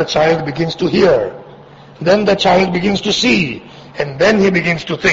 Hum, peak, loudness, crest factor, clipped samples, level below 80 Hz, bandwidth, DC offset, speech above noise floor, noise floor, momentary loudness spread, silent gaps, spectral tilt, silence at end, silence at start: none; 0 dBFS; -14 LUFS; 14 dB; under 0.1%; -44 dBFS; 8 kHz; under 0.1%; 25 dB; -38 dBFS; 11 LU; none; -5 dB/octave; 0 s; 0 s